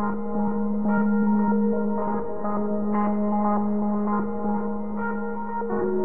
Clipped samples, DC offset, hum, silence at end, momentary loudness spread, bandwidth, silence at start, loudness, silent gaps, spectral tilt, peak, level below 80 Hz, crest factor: under 0.1%; 3%; none; 0 s; 7 LU; 2.5 kHz; 0 s; -25 LUFS; none; -14 dB/octave; -12 dBFS; -50 dBFS; 12 dB